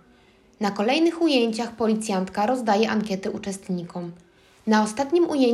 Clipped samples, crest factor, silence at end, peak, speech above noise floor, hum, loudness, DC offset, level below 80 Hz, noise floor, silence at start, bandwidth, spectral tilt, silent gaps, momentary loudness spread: under 0.1%; 16 dB; 0 s; -6 dBFS; 33 dB; none; -23 LUFS; under 0.1%; -62 dBFS; -56 dBFS; 0.6 s; 12.5 kHz; -5 dB/octave; none; 11 LU